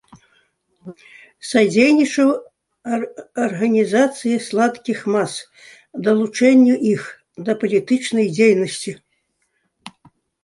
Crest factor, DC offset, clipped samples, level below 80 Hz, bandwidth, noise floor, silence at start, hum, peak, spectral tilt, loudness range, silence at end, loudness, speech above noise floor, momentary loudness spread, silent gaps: 16 dB; under 0.1%; under 0.1%; -66 dBFS; 11.5 kHz; -69 dBFS; 0.85 s; none; -2 dBFS; -5 dB/octave; 3 LU; 0.55 s; -17 LUFS; 52 dB; 16 LU; none